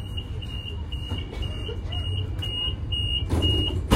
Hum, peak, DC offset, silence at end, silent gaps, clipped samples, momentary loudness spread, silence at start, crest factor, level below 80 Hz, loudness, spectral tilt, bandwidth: none; -4 dBFS; under 0.1%; 0 s; none; under 0.1%; 10 LU; 0 s; 24 dB; -32 dBFS; -28 LUFS; -5.5 dB/octave; 15 kHz